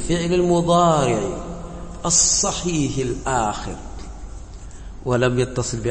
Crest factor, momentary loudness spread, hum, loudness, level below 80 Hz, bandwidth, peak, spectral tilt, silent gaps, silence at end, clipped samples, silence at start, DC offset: 18 dB; 22 LU; none; -19 LUFS; -36 dBFS; 8.8 kHz; -4 dBFS; -4 dB/octave; none; 0 s; under 0.1%; 0 s; under 0.1%